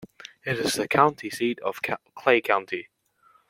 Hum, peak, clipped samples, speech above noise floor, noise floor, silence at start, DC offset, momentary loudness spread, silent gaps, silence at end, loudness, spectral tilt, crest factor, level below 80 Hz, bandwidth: none; -4 dBFS; under 0.1%; 37 dB; -62 dBFS; 0 s; under 0.1%; 14 LU; none; 0.65 s; -25 LUFS; -4 dB/octave; 22 dB; -64 dBFS; 16.5 kHz